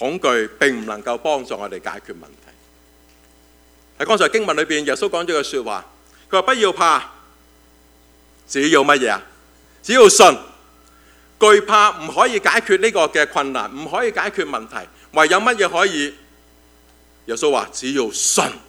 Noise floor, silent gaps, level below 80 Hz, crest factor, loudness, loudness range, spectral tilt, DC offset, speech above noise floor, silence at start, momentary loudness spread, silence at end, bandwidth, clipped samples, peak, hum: -51 dBFS; none; -56 dBFS; 18 dB; -16 LUFS; 8 LU; -2 dB/octave; under 0.1%; 34 dB; 0 s; 16 LU; 0.1 s; 16.5 kHz; under 0.1%; 0 dBFS; 60 Hz at -55 dBFS